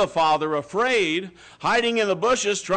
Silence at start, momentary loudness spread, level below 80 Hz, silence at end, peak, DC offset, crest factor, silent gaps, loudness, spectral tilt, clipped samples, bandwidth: 0 s; 7 LU; -56 dBFS; 0 s; -12 dBFS; under 0.1%; 10 dB; none; -22 LUFS; -3 dB/octave; under 0.1%; 9.4 kHz